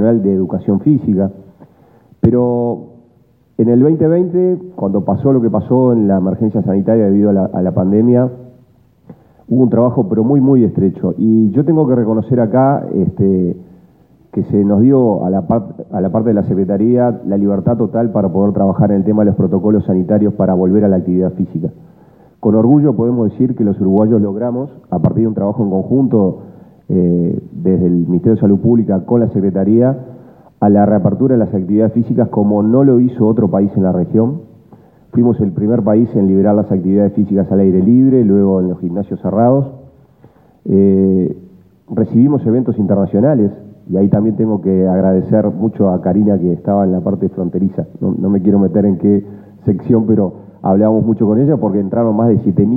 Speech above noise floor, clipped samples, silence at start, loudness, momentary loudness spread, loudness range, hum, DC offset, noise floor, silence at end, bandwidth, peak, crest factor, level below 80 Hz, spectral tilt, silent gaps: 39 dB; under 0.1%; 0 s; -13 LUFS; 7 LU; 2 LU; none; under 0.1%; -51 dBFS; 0 s; 2.4 kHz; 0 dBFS; 12 dB; -48 dBFS; -14 dB/octave; none